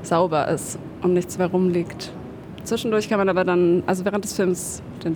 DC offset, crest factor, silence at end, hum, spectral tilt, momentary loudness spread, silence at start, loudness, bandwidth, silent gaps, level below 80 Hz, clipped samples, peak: under 0.1%; 14 dB; 0 s; none; -5.5 dB/octave; 13 LU; 0 s; -22 LUFS; over 20 kHz; none; -54 dBFS; under 0.1%; -8 dBFS